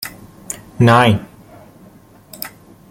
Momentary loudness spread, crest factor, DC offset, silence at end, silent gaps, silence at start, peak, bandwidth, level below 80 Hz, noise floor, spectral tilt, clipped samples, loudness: 20 LU; 18 dB; under 0.1%; 0.45 s; none; 0 s; 0 dBFS; 17 kHz; -50 dBFS; -44 dBFS; -5.5 dB/octave; under 0.1%; -13 LUFS